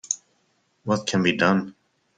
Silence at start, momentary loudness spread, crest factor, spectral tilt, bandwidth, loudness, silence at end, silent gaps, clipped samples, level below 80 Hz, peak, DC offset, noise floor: 0.1 s; 15 LU; 20 dB; -4 dB/octave; 9.4 kHz; -23 LUFS; 0.45 s; none; under 0.1%; -62 dBFS; -6 dBFS; under 0.1%; -68 dBFS